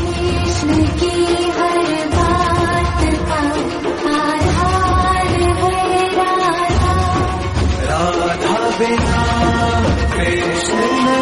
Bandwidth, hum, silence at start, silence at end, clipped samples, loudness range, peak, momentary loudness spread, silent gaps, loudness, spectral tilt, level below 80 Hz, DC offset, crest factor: 11.5 kHz; none; 0 s; 0 s; under 0.1%; 1 LU; -2 dBFS; 3 LU; none; -16 LUFS; -5.5 dB/octave; -24 dBFS; under 0.1%; 12 dB